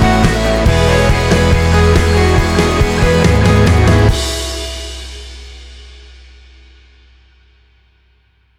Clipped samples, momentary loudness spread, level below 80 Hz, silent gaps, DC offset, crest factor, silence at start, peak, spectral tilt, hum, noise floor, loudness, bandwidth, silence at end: under 0.1%; 17 LU; -20 dBFS; none; under 0.1%; 12 dB; 0 s; 0 dBFS; -5.5 dB/octave; none; -54 dBFS; -12 LUFS; 15.5 kHz; 2.65 s